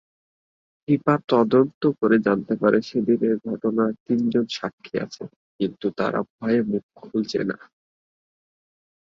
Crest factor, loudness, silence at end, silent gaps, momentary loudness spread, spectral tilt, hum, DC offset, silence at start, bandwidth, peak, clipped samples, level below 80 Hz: 20 dB; -23 LUFS; 1.45 s; 1.74-1.81 s, 4.00-4.06 s, 4.73-4.78 s, 5.36-5.59 s, 6.30-6.39 s, 6.83-6.89 s; 11 LU; -7 dB/octave; none; under 0.1%; 0.9 s; 7.4 kHz; -4 dBFS; under 0.1%; -64 dBFS